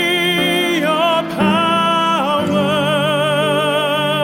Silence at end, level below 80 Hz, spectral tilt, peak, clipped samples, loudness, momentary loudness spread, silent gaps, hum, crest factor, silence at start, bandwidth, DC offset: 0 s; -54 dBFS; -4.5 dB/octave; -2 dBFS; under 0.1%; -15 LUFS; 2 LU; none; none; 12 dB; 0 s; 16.5 kHz; under 0.1%